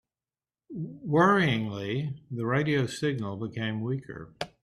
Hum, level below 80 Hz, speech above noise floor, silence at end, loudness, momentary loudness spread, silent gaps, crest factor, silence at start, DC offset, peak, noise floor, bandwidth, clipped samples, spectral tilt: none; -64 dBFS; over 62 dB; 0.15 s; -28 LUFS; 17 LU; none; 18 dB; 0.7 s; under 0.1%; -10 dBFS; under -90 dBFS; 12.5 kHz; under 0.1%; -6.5 dB/octave